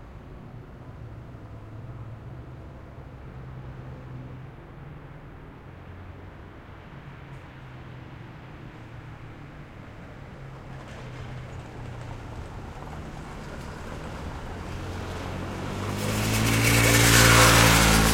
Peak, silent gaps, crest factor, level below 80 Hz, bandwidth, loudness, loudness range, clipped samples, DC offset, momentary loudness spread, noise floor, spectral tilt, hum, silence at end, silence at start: -2 dBFS; none; 24 dB; -38 dBFS; 16.5 kHz; -21 LUFS; 21 LU; under 0.1%; under 0.1%; 26 LU; -44 dBFS; -3.5 dB/octave; none; 0 s; 0 s